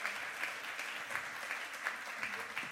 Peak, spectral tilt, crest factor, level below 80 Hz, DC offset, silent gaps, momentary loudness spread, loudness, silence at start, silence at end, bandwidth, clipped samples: -20 dBFS; -0.5 dB/octave; 22 dB; -84 dBFS; under 0.1%; none; 1 LU; -40 LUFS; 0 s; 0 s; 16 kHz; under 0.1%